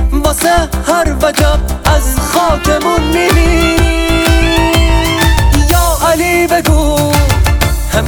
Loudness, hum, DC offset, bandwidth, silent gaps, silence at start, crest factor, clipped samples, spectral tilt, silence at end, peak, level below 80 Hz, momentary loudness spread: -11 LUFS; none; under 0.1%; over 20 kHz; none; 0 s; 10 dB; under 0.1%; -4.5 dB/octave; 0 s; 0 dBFS; -14 dBFS; 3 LU